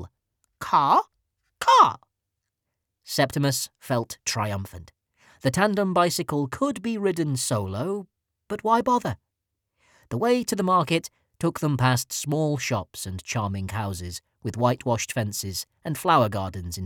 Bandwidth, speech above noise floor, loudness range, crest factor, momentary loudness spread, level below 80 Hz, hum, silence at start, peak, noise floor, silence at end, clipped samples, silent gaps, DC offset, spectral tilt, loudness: 19.5 kHz; 58 dB; 4 LU; 22 dB; 13 LU; -56 dBFS; none; 0 s; -4 dBFS; -83 dBFS; 0 s; under 0.1%; none; under 0.1%; -5 dB/octave; -24 LUFS